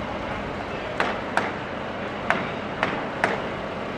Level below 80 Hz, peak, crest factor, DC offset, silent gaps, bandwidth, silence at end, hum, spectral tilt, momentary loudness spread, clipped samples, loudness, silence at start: -48 dBFS; 0 dBFS; 28 dB; under 0.1%; none; 14 kHz; 0 s; none; -5.5 dB/octave; 5 LU; under 0.1%; -27 LUFS; 0 s